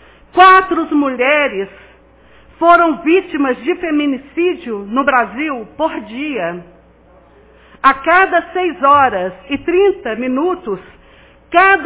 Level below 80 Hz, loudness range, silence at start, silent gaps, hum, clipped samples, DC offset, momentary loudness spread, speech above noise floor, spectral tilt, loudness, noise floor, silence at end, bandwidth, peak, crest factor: -48 dBFS; 5 LU; 0.35 s; none; none; under 0.1%; under 0.1%; 12 LU; 32 dB; -8 dB/octave; -14 LUFS; -46 dBFS; 0 s; 4 kHz; 0 dBFS; 14 dB